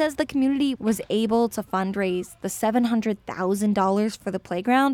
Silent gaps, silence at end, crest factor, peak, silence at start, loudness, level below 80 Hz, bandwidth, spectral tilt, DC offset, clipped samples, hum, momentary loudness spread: none; 0 s; 16 dB; -8 dBFS; 0 s; -24 LUFS; -56 dBFS; 17.5 kHz; -5.5 dB/octave; under 0.1%; under 0.1%; none; 7 LU